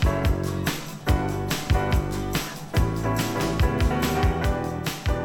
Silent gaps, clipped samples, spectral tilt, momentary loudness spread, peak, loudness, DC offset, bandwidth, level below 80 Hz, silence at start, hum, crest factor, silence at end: none; under 0.1%; -5.5 dB/octave; 5 LU; -8 dBFS; -25 LUFS; under 0.1%; 19.5 kHz; -28 dBFS; 0 s; none; 16 dB; 0 s